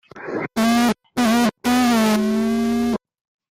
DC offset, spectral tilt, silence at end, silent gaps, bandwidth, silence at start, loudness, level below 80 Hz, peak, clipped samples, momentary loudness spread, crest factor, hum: under 0.1%; -4.5 dB/octave; 0.6 s; none; 16 kHz; 0.15 s; -19 LUFS; -50 dBFS; -10 dBFS; under 0.1%; 9 LU; 10 dB; none